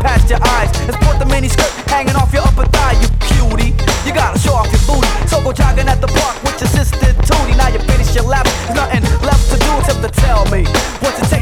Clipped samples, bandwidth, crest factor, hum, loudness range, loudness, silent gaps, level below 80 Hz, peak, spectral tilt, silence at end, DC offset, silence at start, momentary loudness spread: under 0.1%; 16.5 kHz; 10 dB; none; 1 LU; -13 LUFS; none; -14 dBFS; 0 dBFS; -5 dB/octave; 0 s; under 0.1%; 0 s; 3 LU